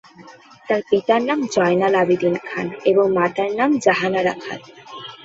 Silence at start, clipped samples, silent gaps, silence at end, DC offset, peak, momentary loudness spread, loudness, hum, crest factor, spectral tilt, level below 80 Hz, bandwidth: 0.2 s; under 0.1%; none; 0.1 s; under 0.1%; -2 dBFS; 15 LU; -18 LUFS; none; 18 dB; -5.5 dB/octave; -62 dBFS; 7.8 kHz